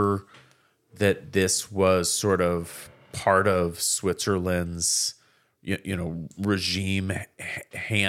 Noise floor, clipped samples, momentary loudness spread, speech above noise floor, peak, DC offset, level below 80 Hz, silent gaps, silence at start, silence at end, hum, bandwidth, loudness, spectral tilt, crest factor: -61 dBFS; under 0.1%; 12 LU; 36 dB; -6 dBFS; under 0.1%; -60 dBFS; none; 0 s; 0 s; none; 16.5 kHz; -25 LUFS; -3.5 dB/octave; 22 dB